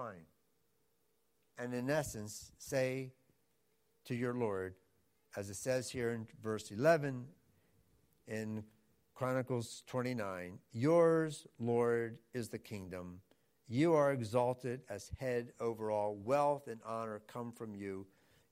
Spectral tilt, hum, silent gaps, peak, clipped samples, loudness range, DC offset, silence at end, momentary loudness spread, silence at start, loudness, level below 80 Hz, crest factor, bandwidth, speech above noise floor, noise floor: -6 dB/octave; none; none; -18 dBFS; under 0.1%; 6 LU; under 0.1%; 0.45 s; 16 LU; 0 s; -38 LUFS; -70 dBFS; 22 dB; 16 kHz; 43 dB; -80 dBFS